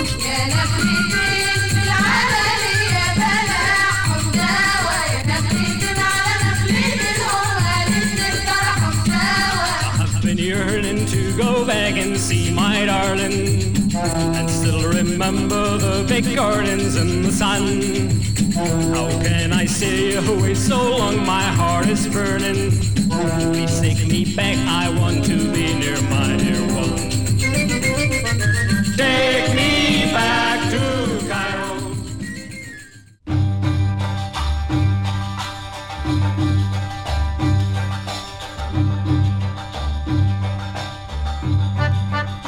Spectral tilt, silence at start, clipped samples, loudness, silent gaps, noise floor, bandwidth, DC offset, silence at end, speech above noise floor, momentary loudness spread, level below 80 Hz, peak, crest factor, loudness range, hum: -4.5 dB/octave; 0 s; under 0.1%; -18 LUFS; none; -42 dBFS; over 20 kHz; 2%; 0 s; 25 dB; 8 LU; -32 dBFS; -4 dBFS; 14 dB; 5 LU; none